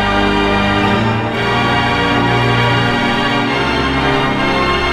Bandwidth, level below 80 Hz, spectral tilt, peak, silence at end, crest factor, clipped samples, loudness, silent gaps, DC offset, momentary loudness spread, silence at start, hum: 13 kHz; -30 dBFS; -5.5 dB/octave; 0 dBFS; 0 s; 12 dB; under 0.1%; -13 LUFS; none; under 0.1%; 2 LU; 0 s; none